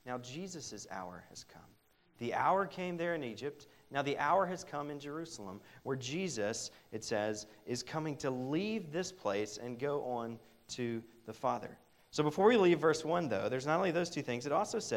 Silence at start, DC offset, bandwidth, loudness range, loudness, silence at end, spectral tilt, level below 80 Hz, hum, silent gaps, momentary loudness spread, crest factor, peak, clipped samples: 0.05 s; under 0.1%; 16 kHz; 7 LU; -36 LUFS; 0 s; -5 dB/octave; -74 dBFS; none; none; 14 LU; 22 dB; -14 dBFS; under 0.1%